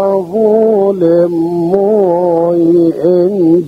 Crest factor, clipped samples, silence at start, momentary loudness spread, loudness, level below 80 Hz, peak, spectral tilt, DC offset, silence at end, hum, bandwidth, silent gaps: 10 dB; under 0.1%; 0 s; 3 LU; -10 LUFS; -52 dBFS; 0 dBFS; -10 dB/octave; under 0.1%; 0 s; none; 5.2 kHz; none